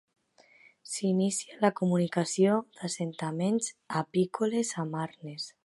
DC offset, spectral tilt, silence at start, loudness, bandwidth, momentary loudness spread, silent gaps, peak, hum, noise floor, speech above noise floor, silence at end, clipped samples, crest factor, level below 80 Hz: under 0.1%; -5.5 dB/octave; 0.85 s; -30 LUFS; 11.5 kHz; 10 LU; none; -10 dBFS; none; -61 dBFS; 32 dB; 0.15 s; under 0.1%; 20 dB; -76 dBFS